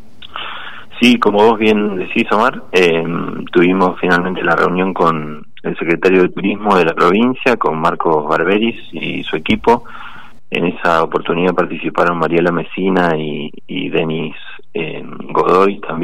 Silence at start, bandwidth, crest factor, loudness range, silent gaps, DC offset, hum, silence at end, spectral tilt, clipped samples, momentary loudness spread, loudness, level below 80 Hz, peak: 0.2 s; 14 kHz; 14 dB; 3 LU; none; 4%; none; 0 s; -6.5 dB/octave; under 0.1%; 14 LU; -14 LUFS; -48 dBFS; 0 dBFS